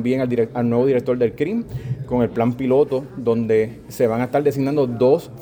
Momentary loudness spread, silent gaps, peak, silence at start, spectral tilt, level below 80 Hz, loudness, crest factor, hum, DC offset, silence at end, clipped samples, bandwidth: 6 LU; none; -4 dBFS; 0 s; -8 dB/octave; -48 dBFS; -20 LUFS; 14 dB; none; under 0.1%; 0 s; under 0.1%; over 20 kHz